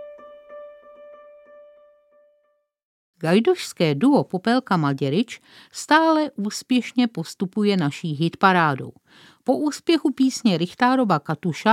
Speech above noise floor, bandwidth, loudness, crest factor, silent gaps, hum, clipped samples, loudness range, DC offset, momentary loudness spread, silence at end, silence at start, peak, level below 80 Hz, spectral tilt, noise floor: 47 dB; 15.5 kHz; -21 LUFS; 20 dB; 2.84-3.13 s; none; under 0.1%; 4 LU; under 0.1%; 14 LU; 0 s; 0 s; -2 dBFS; -74 dBFS; -5.5 dB/octave; -68 dBFS